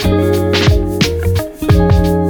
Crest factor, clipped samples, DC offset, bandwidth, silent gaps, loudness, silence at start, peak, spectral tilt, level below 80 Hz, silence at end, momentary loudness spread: 12 dB; under 0.1%; under 0.1%; over 20 kHz; none; -13 LUFS; 0 s; 0 dBFS; -6.5 dB/octave; -20 dBFS; 0 s; 6 LU